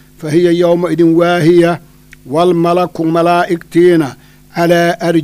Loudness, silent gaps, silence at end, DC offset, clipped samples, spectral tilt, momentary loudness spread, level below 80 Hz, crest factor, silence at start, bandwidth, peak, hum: -11 LUFS; none; 0 s; under 0.1%; under 0.1%; -7 dB/octave; 7 LU; -48 dBFS; 12 dB; 0.2 s; 15 kHz; 0 dBFS; none